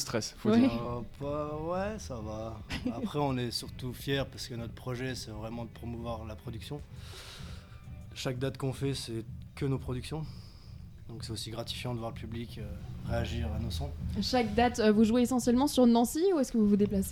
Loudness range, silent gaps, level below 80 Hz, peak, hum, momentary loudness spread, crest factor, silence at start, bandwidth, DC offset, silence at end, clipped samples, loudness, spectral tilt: 12 LU; none; -46 dBFS; -12 dBFS; none; 19 LU; 20 dB; 0 s; 17 kHz; under 0.1%; 0 s; under 0.1%; -32 LUFS; -5.5 dB/octave